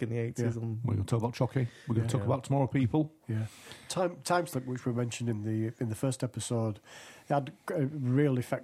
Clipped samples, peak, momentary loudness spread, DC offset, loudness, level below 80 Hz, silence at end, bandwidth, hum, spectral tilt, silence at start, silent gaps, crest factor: under 0.1%; -14 dBFS; 8 LU; under 0.1%; -32 LUFS; -66 dBFS; 0 s; 14 kHz; none; -6.5 dB/octave; 0 s; none; 18 dB